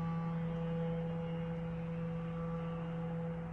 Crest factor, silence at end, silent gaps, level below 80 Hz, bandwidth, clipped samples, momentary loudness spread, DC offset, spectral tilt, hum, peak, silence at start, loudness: 10 dB; 0 s; none; -56 dBFS; 3.9 kHz; under 0.1%; 3 LU; under 0.1%; -10 dB/octave; none; -30 dBFS; 0 s; -40 LUFS